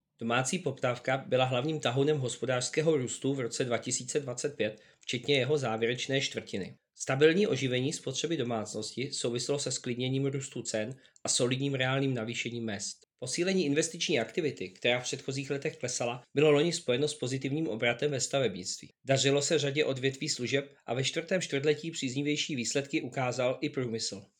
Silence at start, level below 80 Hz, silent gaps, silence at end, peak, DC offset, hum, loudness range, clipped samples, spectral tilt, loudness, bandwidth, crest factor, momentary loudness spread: 0.2 s; -74 dBFS; none; 0.15 s; -10 dBFS; under 0.1%; none; 2 LU; under 0.1%; -4 dB/octave; -31 LUFS; 16.5 kHz; 22 dB; 8 LU